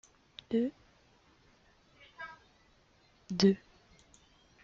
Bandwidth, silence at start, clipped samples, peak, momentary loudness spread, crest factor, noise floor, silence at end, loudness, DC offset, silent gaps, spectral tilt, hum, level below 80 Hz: 7.4 kHz; 0.5 s; under 0.1%; -10 dBFS; 22 LU; 28 dB; -67 dBFS; 1.05 s; -32 LUFS; under 0.1%; none; -6 dB/octave; none; -68 dBFS